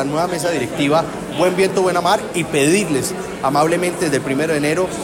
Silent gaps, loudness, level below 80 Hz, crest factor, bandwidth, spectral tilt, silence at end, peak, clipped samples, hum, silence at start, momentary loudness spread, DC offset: none; -17 LUFS; -48 dBFS; 14 dB; 16.5 kHz; -4.5 dB/octave; 0 s; -4 dBFS; under 0.1%; none; 0 s; 5 LU; under 0.1%